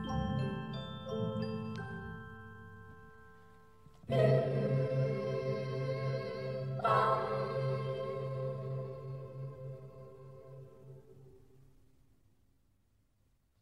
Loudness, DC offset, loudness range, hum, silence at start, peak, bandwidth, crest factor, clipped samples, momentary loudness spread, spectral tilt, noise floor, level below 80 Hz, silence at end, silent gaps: -36 LUFS; under 0.1%; 16 LU; none; 0 s; -16 dBFS; 8.6 kHz; 20 dB; under 0.1%; 23 LU; -8 dB/octave; -74 dBFS; -60 dBFS; 2.25 s; none